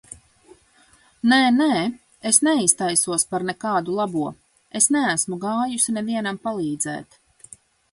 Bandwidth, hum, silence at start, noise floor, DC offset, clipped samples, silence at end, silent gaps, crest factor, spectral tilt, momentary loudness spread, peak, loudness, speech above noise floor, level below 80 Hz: 12 kHz; none; 1.25 s; -56 dBFS; under 0.1%; under 0.1%; 0.9 s; none; 22 dB; -2.5 dB/octave; 11 LU; 0 dBFS; -20 LUFS; 35 dB; -64 dBFS